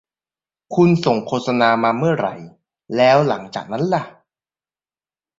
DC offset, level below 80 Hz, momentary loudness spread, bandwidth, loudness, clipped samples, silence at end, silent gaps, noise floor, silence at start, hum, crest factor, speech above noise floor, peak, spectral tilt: under 0.1%; -60 dBFS; 12 LU; 7.6 kHz; -18 LUFS; under 0.1%; 1.3 s; none; under -90 dBFS; 0.7 s; none; 18 dB; over 73 dB; -2 dBFS; -7 dB/octave